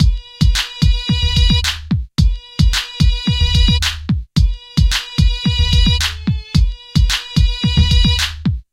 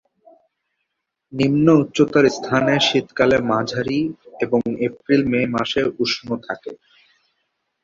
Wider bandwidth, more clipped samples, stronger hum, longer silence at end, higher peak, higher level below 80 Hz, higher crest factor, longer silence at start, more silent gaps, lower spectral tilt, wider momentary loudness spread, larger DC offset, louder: first, 15.5 kHz vs 7.6 kHz; neither; neither; second, 0.1 s vs 1.1 s; about the same, -2 dBFS vs -2 dBFS; first, -18 dBFS vs -54 dBFS; second, 12 dB vs 18 dB; second, 0 s vs 1.3 s; neither; about the same, -4.5 dB/octave vs -5.5 dB/octave; second, 5 LU vs 12 LU; neither; first, -16 LUFS vs -19 LUFS